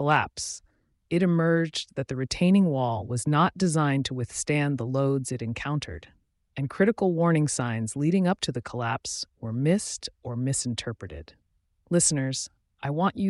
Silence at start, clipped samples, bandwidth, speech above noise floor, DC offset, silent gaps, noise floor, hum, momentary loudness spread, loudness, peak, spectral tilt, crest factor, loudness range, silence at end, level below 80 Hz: 0 s; under 0.1%; 11.5 kHz; 42 dB; under 0.1%; none; -68 dBFS; none; 12 LU; -26 LUFS; -10 dBFS; -5 dB/octave; 18 dB; 4 LU; 0 s; -56 dBFS